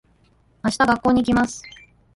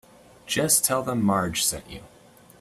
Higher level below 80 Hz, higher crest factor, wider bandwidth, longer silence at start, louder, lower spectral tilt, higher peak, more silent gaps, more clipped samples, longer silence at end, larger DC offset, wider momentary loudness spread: first, -46 dBFS vs -54 dBFS; about the same, 16 dB vs 20 dB; second, 11.5 kHz vs 15.5 kHz; first, 0.65 s vs 0.45 s; about the same, -20 LUFS vs -22 LUFS; first, -5 dB/octave vs -3 dB/octave; about the same, -6 dBFS vs -6 dBFS; neither; neither; about the same, 0.45 s vs 0.55 s; neither; second, 9 LU vs 19 LU